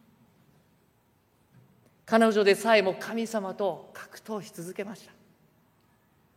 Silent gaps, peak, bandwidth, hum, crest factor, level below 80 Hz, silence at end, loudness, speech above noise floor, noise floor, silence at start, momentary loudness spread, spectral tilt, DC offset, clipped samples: none; -8 dBFS; 16 kHz; none; 22 dB; -78 dBFS; 1.4 s; -27 LUFS; 40 dB; -67 dBFS; 2.05 s; 20 LU; -4.5 dB/octave; under 0.1%; under 0.1%